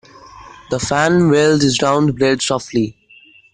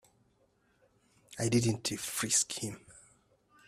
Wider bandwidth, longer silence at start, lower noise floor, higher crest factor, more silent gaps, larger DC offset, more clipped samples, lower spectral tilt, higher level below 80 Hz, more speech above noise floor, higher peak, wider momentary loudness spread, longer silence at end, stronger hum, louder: second, 10 kHz vs 15.5 kHz; second, 0.35 s vs 1.3 s; second, -47 dBFS vs -71 dBFS; second, 14 dB vs 20 dB; neither; neither; neither; first, -5 dB/octave vs -3.5 dB/octave; first, -46 dBFS vs -66 dBFS; second, 32 dB vs 39 dB; first, -2 dBFS vs -16 dBFS; second, 9 LU vs 16 LU; about the same, 0.65 s vs 0.7 s; neither; first, -15 LUFS vs -31 LUFS